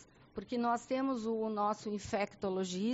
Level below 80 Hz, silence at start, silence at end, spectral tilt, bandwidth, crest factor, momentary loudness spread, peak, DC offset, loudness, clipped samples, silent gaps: -68 dBFS; 0 s; 0 s; -5 dB/octave; 8 kHz; 14 dB; 6 LU; -22 dBFS; under 0.1%; -36 LUFS; under 0.1%; none